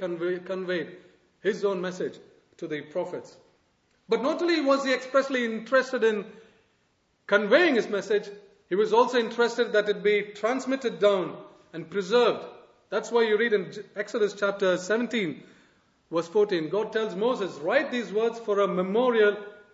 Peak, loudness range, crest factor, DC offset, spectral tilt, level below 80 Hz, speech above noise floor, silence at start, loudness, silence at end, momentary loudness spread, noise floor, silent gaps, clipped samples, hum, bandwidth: -6 dBFS; 5 LU; 20 dB; under 0.1%; -5 dB/octave; -78 dBFS; 44 dB; 0 s; -26 LUFS; 0.2 s; 13 LU; -70 dBFS; none; under 0.1%; none; 8 kHz